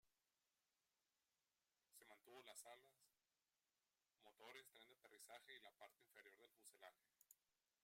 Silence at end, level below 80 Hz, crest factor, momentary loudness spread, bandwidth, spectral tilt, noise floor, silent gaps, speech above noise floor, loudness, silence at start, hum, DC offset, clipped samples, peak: 0.3 s; under -90 dBFS; 24 dB; 7 LU; 16 kHz; -0.5 dB/octave; under -90 dBFS; none; over 23 dB; -66 LUFS; 0.05 s; none; under 0.1%; under 0.1%; -46 dBFS